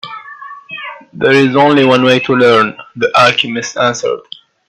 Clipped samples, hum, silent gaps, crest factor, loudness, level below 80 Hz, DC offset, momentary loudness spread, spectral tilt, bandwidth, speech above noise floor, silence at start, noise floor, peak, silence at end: under 0.1%; none; none; 12 dB; -10 LUFS; -54 dBFS; under 0.1%; 19 LU; -4.5 dB/octave; 11.5 kHz; 21 dB; 0.05 s; -31 dBFS; 0 dBFS; 0.5 s